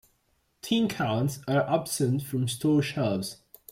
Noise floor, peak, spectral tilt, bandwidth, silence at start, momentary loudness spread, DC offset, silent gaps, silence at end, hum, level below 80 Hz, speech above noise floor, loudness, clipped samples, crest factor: -71 dBFS; -10 dBFS; -5.5 dB/octave; 16.5 kHz; 0.65 s; 8 LU; under 0.1%; none; 0.35 s; none; -62 dBFS; 44 dB; -27 LUFS; under 0.1%; 16 dB